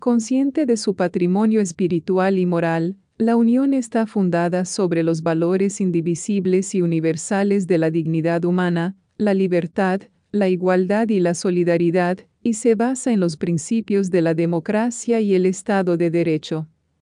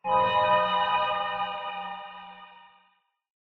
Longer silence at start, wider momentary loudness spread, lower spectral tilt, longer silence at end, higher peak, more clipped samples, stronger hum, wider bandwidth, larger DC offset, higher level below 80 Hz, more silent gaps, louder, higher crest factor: about the same, 0 s vs 0.05 s; second, 4 LU vs 19 LU; about the same, -6.5 dB/octave vs -5.5 dB/octave; second, 0.35 s vs 0.95 s; first, -6 dBFS vs -10 dBFS; neither; neither; first, 10.5 kHz vs 6 kHz; neither; about the same, -66 dBFS vs -62 dBFS; neither; first, -20 LUFS vs -26 LUFS; second, 12 dB vs 18 dB